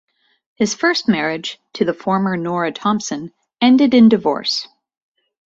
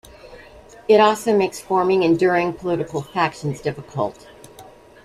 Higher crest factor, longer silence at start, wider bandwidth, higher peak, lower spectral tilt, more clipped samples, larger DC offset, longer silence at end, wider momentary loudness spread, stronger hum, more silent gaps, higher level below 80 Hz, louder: about the same, 16 dB vs 18 dB; first, 0.6 s vs 0.25 s; second, 7.8 kHz vs 14.5 kHz; about the same, -2 dBFS vs -2 dBFS; about the same, -4.5 dB/octave vs -5.5 dB/octave; neither; neither; first, 0.85 s vs 0.4 s; about the same, 14 LU vs 12 LU; neither; neither; second, -60 dBFS vs -54 dBFS; about the same, -17 LUFS vs -19 LUFS